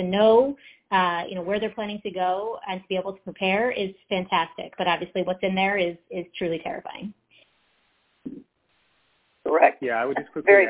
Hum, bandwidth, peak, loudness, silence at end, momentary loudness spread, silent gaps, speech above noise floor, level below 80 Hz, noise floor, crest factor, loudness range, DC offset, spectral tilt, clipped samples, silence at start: none; 4 kHz; -2 dBFS; -25 LUFS; 0 s; 16 LU; none; 45 dB; -62 dBFS; -68 dBFS; 22 dB; 8 LU; under 0.1%; -8.5 dB/octave; under 0.1%; 0 s